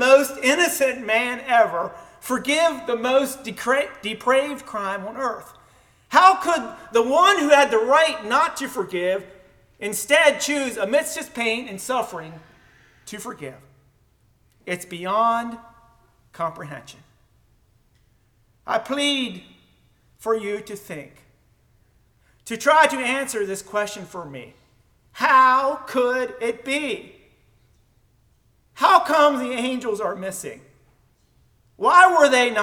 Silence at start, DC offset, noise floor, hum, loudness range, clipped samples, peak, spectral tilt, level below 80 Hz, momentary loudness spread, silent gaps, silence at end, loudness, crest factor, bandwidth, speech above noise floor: 0 s; under 0.1%; -61 dBFS; none; 10 LU; under 0.1%; 0 dBFS; -2.5 dB/octave; -62 dBFS; 19 LU; none; 0 s; -20 LUFS; 22 dB; 18.5 kHz; 40 dB